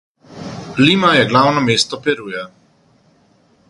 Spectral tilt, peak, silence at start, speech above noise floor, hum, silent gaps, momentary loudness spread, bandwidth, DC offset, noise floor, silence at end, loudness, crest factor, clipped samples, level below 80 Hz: -4.5 dB/octave; 0 dBFS; 0.3 s; 40 dB; none; none; 19 LU; 11.5 kHz; under 0.1%; -54 dBFS; 1.2 s; -14 LUFS; 18 dB; under 0.1%; -54 dBFS